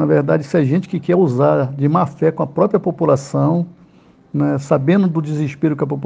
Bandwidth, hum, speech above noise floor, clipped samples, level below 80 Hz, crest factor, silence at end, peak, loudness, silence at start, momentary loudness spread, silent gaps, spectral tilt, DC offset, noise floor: 9.2 kHz; none; 32 dB; under 0.1%; -58 dBFS; 16 dB; 0 s; 0 dBFS; -17 LUFS; 0 s; 5 LU; none; -9 dB/octave; under 0.1%; -48 dBFS